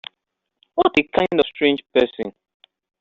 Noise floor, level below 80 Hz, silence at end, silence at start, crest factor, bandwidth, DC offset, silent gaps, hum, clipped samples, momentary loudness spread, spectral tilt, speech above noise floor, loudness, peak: -79 dBFS; -54 dBFS; 0.7 s; 0.75 s; 18 dB; 7.4 kHz; under 0.1%; none; none; under 0.1%; 14 LU; -2.5 dB/octave; 60 dB; -19 LUFS; -2 dBFS